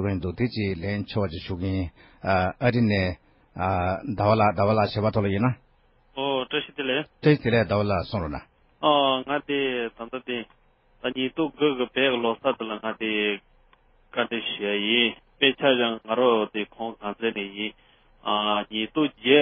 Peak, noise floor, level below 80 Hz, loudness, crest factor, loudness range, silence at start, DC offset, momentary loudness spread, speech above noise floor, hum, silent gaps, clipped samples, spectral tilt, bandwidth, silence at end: -4 dBFS; -61 dBFS; -46 dBFS; -25 LUFS; 20 dB; 3 LU; 0 s; under 0.1%; 12 LU; 36 dB; none; none; under 0.1%; -10.5 dB/octave; 5.8 kHz; 0 s